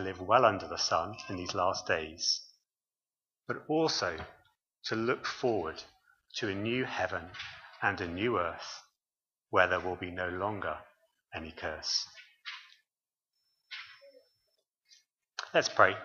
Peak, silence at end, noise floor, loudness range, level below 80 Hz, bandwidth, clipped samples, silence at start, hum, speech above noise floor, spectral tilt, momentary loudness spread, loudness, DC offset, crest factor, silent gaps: -6 dBFS; 0 s; under -90 dBFS; 7 LU; -64 dBFS; 7.4 kHz; under 0.1%; 0 s; none; over 58 dB; -3.5 dB/octave; 17 LU; -32 LUFS; under 0.1%; 28 dB; none